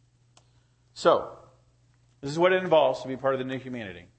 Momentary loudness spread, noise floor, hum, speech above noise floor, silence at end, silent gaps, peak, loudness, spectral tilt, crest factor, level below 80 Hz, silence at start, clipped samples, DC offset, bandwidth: 16 LU; -63 dBFS; none; 38 dB; 0.15 s; none; -6 dBFS; -25 LUFS; -5.5 dB/octave; 22 dB; -66 dBFS; 0.95 s; under 0.1%; under 0.1%; 8.8 kHz